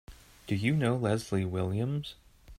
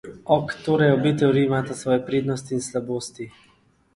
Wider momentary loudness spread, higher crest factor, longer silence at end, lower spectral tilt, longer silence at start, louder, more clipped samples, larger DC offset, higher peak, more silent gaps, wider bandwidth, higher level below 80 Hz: about the same, 10 LU vs 11 LU; about the same, 18 dB vs 20 dB; second, 0.05 s vs 0.65 s; about the same, -7 dB/octave vs -6 dB/octave; about the same, 0.1 s vs 0.05 s; second, -31 LUFS vs -22 LUFS; neither; neither; second, -14 dBFS vs -4 dBFS; neither; first, 15.5 kHz vs 11.5 kHz; about the same, -56 dBFS vs -58 dBFS